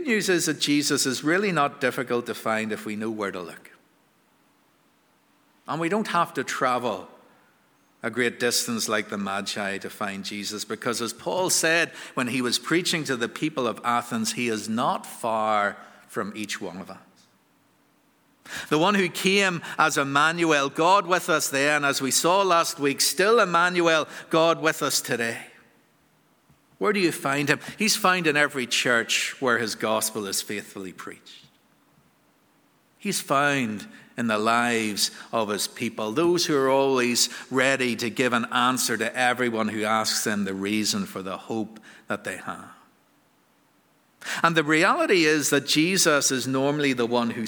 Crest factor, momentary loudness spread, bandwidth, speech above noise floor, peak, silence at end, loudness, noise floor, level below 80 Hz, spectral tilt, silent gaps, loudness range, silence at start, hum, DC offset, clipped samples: 24 dB; 12 LU; over 20 kHz; 39 dB; -2 dBFS; 0 s; -23 LUFS; -63 dBFS; -74 dBFS; -3 dB/octave; none; 9 LU; 0 s; none; under 0.1%; under 0.1%